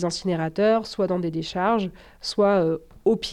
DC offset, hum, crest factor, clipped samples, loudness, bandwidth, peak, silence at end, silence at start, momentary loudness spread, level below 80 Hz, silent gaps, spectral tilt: under 0.1%; none; 14 dB; under 0.1%; -24 LUFS; 13 kHz; -10 dBFS; 0 s; 0 s; 8 LU; -52 dBFS; none; -5.5 dB/octave